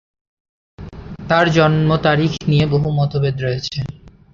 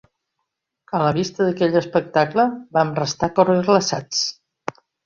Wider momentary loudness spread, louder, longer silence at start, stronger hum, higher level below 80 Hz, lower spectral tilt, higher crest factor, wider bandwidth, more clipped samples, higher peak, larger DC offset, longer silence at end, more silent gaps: first, 19 LU vs 10 LU; first, -16 LUFS vs -20 LUFS; about the same, 0.8 s vs 0.9 s; neither; first, -40 dBFS vs -56 dBFS; first, -7 dB/octave vs -5 dB/octave; about the same, 16 dB vs 18 dB; about the same, 7.2 kHz vs 7.4 kHz; neither; about the same, 0 dBFS vs -2 dBFS; neither; second, 0.25 s vs 0.75 s; neither